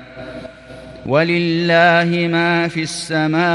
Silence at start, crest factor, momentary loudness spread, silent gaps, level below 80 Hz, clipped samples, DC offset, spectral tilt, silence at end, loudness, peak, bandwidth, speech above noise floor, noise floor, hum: 0 s; 16 dB; 21 LU; none; -50 dBFS; under 0.1%; under 0.1%; -5.5 dB/octave; 0 s; -15 LUFS; 0 dBFS; 11.5 kHz; 21 dB; -36 dBFS; none